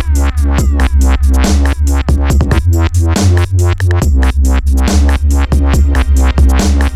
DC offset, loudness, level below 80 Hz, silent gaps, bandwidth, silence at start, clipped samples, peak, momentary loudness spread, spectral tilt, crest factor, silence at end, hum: under 0.1%; -11 LUFS; -10 dBFS; none; 13.5 kHz; 0 s; under 0.1%; 0 dBFS; 2 LU; -6 dB/octave; 8 dB; 0 s; none